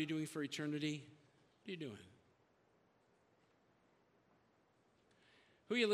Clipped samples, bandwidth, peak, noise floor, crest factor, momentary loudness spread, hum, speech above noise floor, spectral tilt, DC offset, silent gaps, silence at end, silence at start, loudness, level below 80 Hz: under 0.1%; 13.5 kHz; -24 dBFS; -75 dBFS; 22 dB; 17 LU; none; 32 dB; -5 dB/octave; under 0.1%; none; 0 s; 0 s; -43 LUFS; -88 dBFS